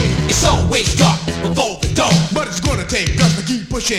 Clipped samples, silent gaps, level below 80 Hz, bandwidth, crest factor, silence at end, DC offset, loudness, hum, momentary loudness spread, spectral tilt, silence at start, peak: under 0.1%; none; -26 dBFS; 15.5 kHz; 14 dB; 0 s; under 0.1%; -15 LUFS; none; 6 LU; -4 dB/octave; 0 s; 0 dBFS